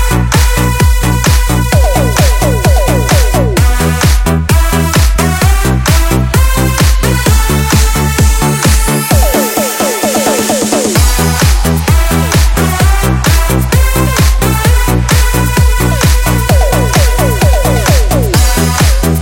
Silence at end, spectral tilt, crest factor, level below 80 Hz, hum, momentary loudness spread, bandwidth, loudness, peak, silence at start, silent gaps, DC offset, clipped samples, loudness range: 0 s; -4.5 dB/octave; 8 dB; -12 dBFS; none; 1 LU; 17 kHz; -10 LUFS; 0 dBFS; 0 s; none; under 0.1%; 0.1%; 0 LU